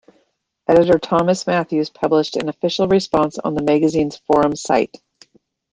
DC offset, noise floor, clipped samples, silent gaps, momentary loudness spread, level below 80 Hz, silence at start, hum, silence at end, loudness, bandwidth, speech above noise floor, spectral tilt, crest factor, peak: under 0.1%; -66 dBFS; under 0.1%; none; 6 LU; -50 dBFS; 0.7 s; none; 0.85 s; -18 LUFS; 9.8 kHz; 49 dB; -5.5 dB/octave; 16 dB; -2 dBFS